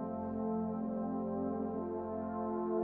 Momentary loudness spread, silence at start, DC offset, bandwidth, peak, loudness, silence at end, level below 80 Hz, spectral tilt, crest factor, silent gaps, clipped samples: 3 LU; 0 s; under 0.1%; 2.5 kHz; -24 dBFS; -38 LUFS; 0 s; -66 dBFS; -11 dB/octave; 12 dB; none; under 0.1%